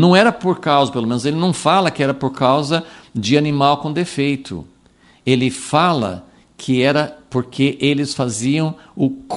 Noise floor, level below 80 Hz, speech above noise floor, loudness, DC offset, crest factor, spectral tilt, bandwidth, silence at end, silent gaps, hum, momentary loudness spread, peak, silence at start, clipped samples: -51 dBFS; -54 dBFS; 35 dB; -17 LUFS; under 0.1%; 16 dB; -5.5 dB/octave; 11.5 kHz; 0 s; none; none; 9 LU; 0 dBFS; 0 s; under 0.1%